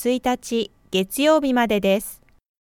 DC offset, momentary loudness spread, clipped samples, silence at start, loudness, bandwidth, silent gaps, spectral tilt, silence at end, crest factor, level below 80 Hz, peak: under 0.1%; 8 LU; under 0.1%; 0 s; -21 LUFS; 18.5 kHz; none; -4.5 dB/octave; 0.45 s; 18 dB; -52 dBFS; -4 dBFS